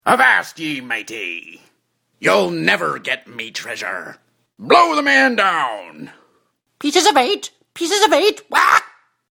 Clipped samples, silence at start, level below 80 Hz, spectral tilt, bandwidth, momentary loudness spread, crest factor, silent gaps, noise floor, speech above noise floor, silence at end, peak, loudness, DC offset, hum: under 0.1%; 0.05 s; -64 dBFS; -2.5 dB/octave; 19 kHz; 15 LU; 18 dB; none; -66 dBFS; 50 dB; 0.45 s; 0 dBFS; -16 LUFS; under 0.1%; none